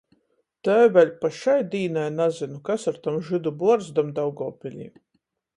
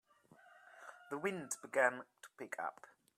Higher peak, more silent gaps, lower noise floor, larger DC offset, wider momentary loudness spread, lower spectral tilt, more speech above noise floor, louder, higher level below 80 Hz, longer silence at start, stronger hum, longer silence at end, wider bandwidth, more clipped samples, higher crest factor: first, -6 dBFS vs -18 dBFS; neither; first, -73 dBFS vs -66 dBFS; neither; second, 15 LU vs 22 LU; first, -6.5 dB/octave vs -3.5 dB/octave; first, 51 dB vs 27 dB; first, -23 LUFS vs -40 LUFS; first, -70 dBFS vs under -90 dBFS; first, 0.65 s vs 0.45 s; neither; first, 0.7 s vs 0.3 s; second, 10.5 kHz vs 14.5 kHz; neither; second, 18 dB vs 24 dB